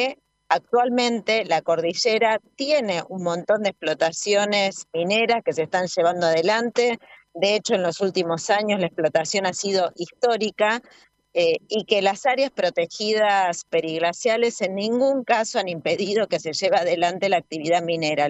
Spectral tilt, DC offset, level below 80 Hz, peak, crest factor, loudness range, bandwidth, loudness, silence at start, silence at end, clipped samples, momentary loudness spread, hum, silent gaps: -3.5 dB/octave; under 0.1%; -72 dBFS; -4 dBFS; 18 dB; 1 LU; 8.4 kHz; -22 LUFS; 0 s; 0 s; under 0.1%; 5 LU; none; none